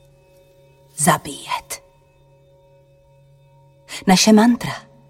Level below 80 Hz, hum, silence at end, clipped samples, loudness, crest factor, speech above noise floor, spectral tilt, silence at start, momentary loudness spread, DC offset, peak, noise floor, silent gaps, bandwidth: -54 dBFS; none; 0.3 s; under 0.1%; -17 LUFS; 20 dB; 38 dB; -4 dB/octave; 0.95 s; 21 LU; under 0.1%; -2 dBFS; -53 dBFS; none; 16.5 kHz